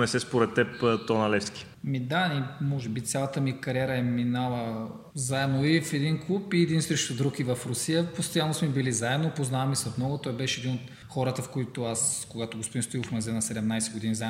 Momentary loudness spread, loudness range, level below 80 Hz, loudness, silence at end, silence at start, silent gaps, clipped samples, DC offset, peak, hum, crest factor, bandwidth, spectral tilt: 7 LU; 3 LU; -62 dBFS; -28 LUFS; 0 s; 0 s; none; under 0.1%; under 0.1%; -8 dBFS; none; 20 dB; 16 kHz; -4.5 dB/octave